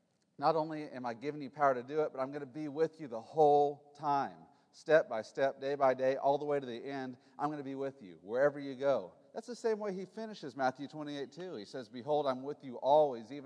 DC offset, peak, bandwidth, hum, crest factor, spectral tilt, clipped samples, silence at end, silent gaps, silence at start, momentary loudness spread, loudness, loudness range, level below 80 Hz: under 0.1%; -14 dBFS; 10 kHz; none; 20 dB; -6 dB/octave; under 0.1%; 0 s; none; 0.4 s; 14 LU; -35 LUFS; 6 LU; under -90 dBFS